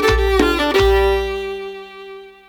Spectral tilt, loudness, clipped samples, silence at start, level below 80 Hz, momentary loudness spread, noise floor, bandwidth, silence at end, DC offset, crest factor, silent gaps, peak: -5 dB/octave; -16 LUFS; under 0.1%; 0 s; -26 dBFS; 20 LU; -36 dBFS; 18.5 kHz; 0.2 s; under 0.1%; 18 dB; none; 0 dBFS